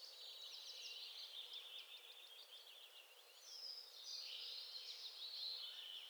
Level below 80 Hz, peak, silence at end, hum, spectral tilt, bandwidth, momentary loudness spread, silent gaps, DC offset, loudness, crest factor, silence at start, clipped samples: under -90 dBFS; -38 dBFS; 0 s; none; 5 dB/octave; over 20 kHz; 11 LU; none; under 0.1%; -51 LUFS; 18 dB; 0 s; under 0.1%